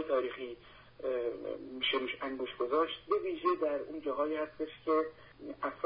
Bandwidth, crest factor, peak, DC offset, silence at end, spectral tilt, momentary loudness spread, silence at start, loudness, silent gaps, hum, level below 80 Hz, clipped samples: 5 kHz; 18 dB; -18 dBFS; under 0.1%; 0 s; -1 dB/octave; 10 LU; 0 s; -35 LUFS; none; none; -68 dBFS; under 0.1%